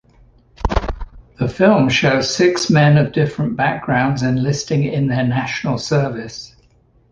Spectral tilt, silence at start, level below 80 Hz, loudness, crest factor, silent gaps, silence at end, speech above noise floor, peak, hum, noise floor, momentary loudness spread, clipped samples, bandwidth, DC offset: -6 dB/octave; 0.6 s; -34 dBFS; -17 LUFS; 16 dB; none; 0.65 s; 38 dB; -2 dBFS; none; -54 dBFS; 11 LU; under 0.1%; 9.2 kHz; under 0.1%